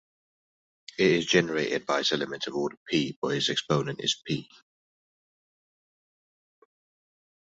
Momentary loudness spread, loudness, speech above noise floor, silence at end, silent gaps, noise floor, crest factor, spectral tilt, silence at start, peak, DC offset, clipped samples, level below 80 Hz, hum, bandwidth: 8 LU; -27 LUFS; over 63 dB; 3.15 s; 2.77-2.86 s, 3.16-3.22 s; under -90 dBFS; 24 dB; -4 dB/octave; 1 s; -8 dBFS; under 0.1%; under 0.1%; -68 dBFS; none; 8 kHz